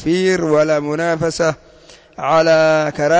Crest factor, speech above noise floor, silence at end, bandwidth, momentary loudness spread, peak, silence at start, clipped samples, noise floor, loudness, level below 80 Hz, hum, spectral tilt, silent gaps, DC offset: 10 dB; 30 dB; 0 s; 8 kHz; 7 LU; -4 dBFS; 0 s; under 0.1%; -44 dBFS; -15 LUFS; -50 dBFS; none; -5 dB/octave; none; under 0.1%